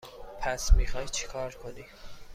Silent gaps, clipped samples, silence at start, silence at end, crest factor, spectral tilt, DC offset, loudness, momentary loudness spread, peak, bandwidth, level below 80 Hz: none; under 0.1%; 0.05 s; 0 s; 20 dB; -3.5 dB/octave; under 0.1%; -32 LUFS; 20 LU; -8 dBFS; 15 kHz; -30 dBFS